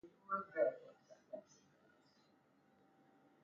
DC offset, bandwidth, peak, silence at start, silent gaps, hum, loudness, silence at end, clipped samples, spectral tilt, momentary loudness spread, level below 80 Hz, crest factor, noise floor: under 0.1%; 7.2 kHz; -24 dBFS; 0.05 s; none; none; -41 LUFS; 2.05 s; under 0.1%; -4.5 dB/octave; 19 LU; under -90 dBFS; 24 dB; -74 dBFS